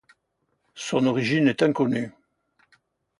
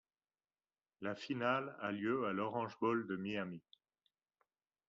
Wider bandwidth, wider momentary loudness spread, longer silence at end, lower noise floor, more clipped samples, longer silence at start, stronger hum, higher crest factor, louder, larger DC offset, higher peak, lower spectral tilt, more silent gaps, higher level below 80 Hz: first, 11 kHz vs 7.4 kHz; first, 12 LU vs 9 LU; second, 1.1 s vs 1.3 s; second, -74 dBFS vs under -90 dBFS; neither; second, 0.75 s vs 1 s; neither; about the same, 18 dB vs 20 dB; first, -23 LUFS vs -40 LUFS; neither; first, -8 dBFS vs -22 dBFS; first, -6 dB/octave vs -4.5 dB/octave; neither; first, -66 dBFS vs -84 dBFS